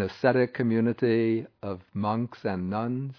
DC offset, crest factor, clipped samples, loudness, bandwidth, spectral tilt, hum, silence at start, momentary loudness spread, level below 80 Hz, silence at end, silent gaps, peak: under 0.1%; 20 dB; under 0.1%; -27 LUFS; 5.4 kHz; -9 dB/octave; none; 0 s; 9 LU; -66 dBFS; 0.05 s; none; -8 dBFS